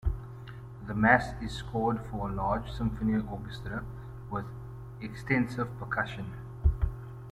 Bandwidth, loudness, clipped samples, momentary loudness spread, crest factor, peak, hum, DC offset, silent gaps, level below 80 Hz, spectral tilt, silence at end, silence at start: 13.5 kHz; -31 LUFS; under 0.1%; 17 LU; 26 dB; -6 dBFS; none; under 0.1%; none; -40 dBFS; -7.5 dB/octave; 0 s; 0 s